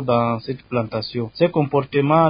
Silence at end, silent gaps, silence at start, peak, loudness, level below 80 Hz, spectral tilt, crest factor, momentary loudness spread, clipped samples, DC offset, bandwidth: 0 s; none; 0 s; -2 dBFS; -21 LUFS; -54 dBFS; -12 dB/octave; 16 dB; 8 LU; under 0.1%; under 0.1%; 5.2 kHz